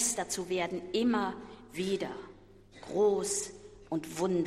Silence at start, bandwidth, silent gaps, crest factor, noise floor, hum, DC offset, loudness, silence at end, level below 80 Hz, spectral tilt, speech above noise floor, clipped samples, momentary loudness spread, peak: 0 s; 16 kHz; none; 16 dB; -55 dBFS; none; under 0.1%; -33 LUFS; 0 s; -62 dBFS; -3.5 dB/octave; 24 dB; under 0.1%; 18 LU; -18 dBFS